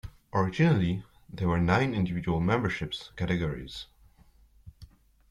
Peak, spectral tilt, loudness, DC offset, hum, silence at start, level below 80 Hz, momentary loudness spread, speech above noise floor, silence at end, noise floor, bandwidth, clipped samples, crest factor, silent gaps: -10 dBFS; -7.5 dB/octave; -28 LUFS; under 0.1%; none; 0.05 s; -50 dBFS; 15 LU; 32 dB; 0.45 s; -59 dBFS; 11 kHz; under 0.1%; 20 dB; none